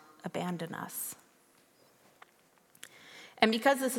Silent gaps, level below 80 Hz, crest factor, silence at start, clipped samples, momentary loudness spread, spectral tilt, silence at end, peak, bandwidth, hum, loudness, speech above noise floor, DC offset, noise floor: none; -78 dBFS; 30 dB; 0.25 s; under 0.1%; 24 LU; -3.5 dB/octave; 0 s; -6 dBFS; 17.5 kHz; none; -32 LUFS; 35 dB; under 0.1%; -66 dBFS